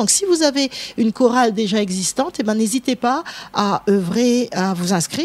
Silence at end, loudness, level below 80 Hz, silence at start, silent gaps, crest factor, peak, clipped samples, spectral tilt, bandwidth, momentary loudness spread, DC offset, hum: 0 s; -18 LUFS; -58 dBFS; 0 s; none; 18 dB; 0 dBFS; under 0.1%; -4 dB/octave; 15 kHz; 6 LU; under 0.1%; none